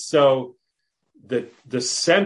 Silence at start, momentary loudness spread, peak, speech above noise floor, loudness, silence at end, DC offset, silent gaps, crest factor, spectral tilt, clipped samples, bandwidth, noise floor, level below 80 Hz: 0 s; 12 LU; -4 dBFS; 57 dB; -22 LUFS; 0 s; under 0.1%; none; 18 dB; -3.5 dB/octave; under 0.1%; 11.5 kHz; -77 dBFS; -72 dBFS